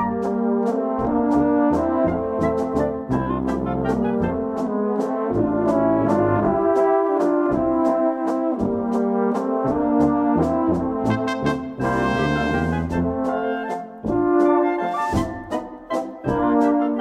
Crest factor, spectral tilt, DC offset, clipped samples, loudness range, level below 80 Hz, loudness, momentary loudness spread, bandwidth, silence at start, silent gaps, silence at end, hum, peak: 14 dB; -8 dB/octave; under 0.1%; under 0.1%; 3 LU; -42 dBFS; -21 LUFS; 6 LU; 11 kHz; 0 s; none; 0 s; none; -6 dBFS